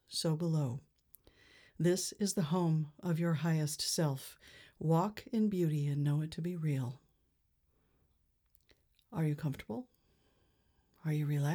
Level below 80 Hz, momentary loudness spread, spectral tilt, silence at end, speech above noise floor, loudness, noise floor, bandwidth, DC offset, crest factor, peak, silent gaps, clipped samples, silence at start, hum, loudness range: -70 dBFS; 11 LU; -6 dB/octave; 0 s; 42 dB; -35 LUFS; -76 dBFS; 19.5 kHz; under 0.1%; 16 dB; -20 dBFS; none; under 0.1%; 0.1 s; none; 9 LU